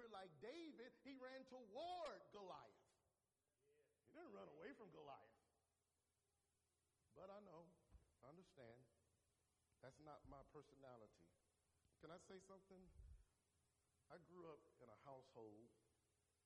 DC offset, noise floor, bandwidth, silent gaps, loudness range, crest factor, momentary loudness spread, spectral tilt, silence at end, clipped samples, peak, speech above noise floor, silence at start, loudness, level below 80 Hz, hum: under 0.1%; under -90 dBFS; 11 kHz; none; 9 LU; 20 dB; 12 LU; -5 dB/octave; 0.5 s; under 0.1%; -44 dBFS; over 28 dB; 0 s; -62 LUFS; -82 dBFS; none